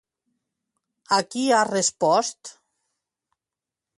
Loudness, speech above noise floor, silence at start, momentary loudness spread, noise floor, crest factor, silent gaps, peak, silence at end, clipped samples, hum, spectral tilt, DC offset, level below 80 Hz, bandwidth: -22 LUFS; 67 dB; 1.1 s; 16 LU; -89 dBFS; 20 dB; none; -6 dBFS; 1.5 s; under 0.1%; none; -2.5 dB/octave; under 0.1%; -74 dBFS; 11.5 kHz